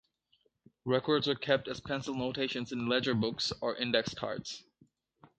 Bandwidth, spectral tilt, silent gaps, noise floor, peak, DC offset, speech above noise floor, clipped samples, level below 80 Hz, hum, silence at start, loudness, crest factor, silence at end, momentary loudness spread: 9 kHz; -5 dB/octave; none; -74 dBFS; -12 dBFS; under 0.1%; 41 dB; under 0.1%; -66 dBFS; none; 0.85 s; -33 LUFS; 22 dB; 0.15 s; 8 LU